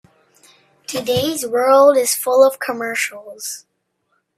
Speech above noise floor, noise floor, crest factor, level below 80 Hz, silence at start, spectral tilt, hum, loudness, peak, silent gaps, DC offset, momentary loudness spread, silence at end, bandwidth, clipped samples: 52 dB; -68 dBFS; 18 dB; -60 dBFS; 0.9 s; -3 dB/octave; none; -16 LUFS; 0 dBFS; none; under 0.1%; 17 LU; 0.8 s; 16 kHz; under 0.1%